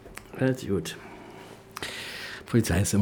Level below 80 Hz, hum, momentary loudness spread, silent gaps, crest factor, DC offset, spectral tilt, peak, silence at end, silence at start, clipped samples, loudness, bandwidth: -50 dBFS; none; 20 LU; none; 20 dB; under 0.1%; -5 dB/octave; -10 dBFS; 0 s; 0 s; under 0.1%; -29 LUFS; 19.5 kHz